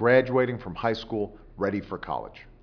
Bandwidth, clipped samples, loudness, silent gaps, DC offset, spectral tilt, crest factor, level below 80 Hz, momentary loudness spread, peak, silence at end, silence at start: 5.4 kHz; under 0.1%; -28 LUFS; none; under 0.1%; -8 dB/octave; 20 dB; -52 dBFS; 13 LU; -6 dBFS; 0.1 s; 0 s